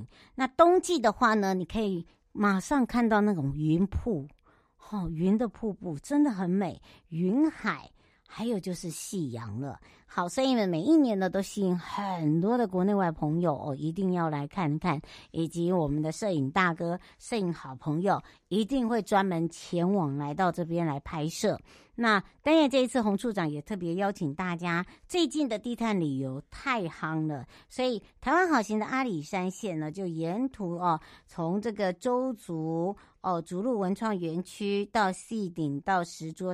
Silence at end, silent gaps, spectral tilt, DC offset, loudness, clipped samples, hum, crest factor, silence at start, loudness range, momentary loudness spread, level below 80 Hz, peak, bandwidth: 0 s; none; -6 dB/octave; under 0.1%; -29 LUFS; under 0.1%; none; 22 dB; 0 s; 4 LU; 11 LU; -54 dBFS; -8 dBFS; 15 kHz